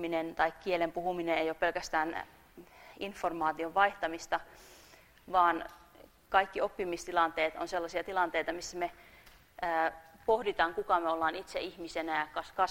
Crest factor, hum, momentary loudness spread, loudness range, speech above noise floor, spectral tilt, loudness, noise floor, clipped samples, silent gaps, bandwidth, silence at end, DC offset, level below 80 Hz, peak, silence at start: 22 dB; none; 10 LU; 2 LU; 26 dB; -3.5 dB/octave; -33 LUFS; -59 dBFS; under 0.1%; none; 16 kHz; 0 s; under 0.1%; -62 dBFS; -12 dBFS; 0 s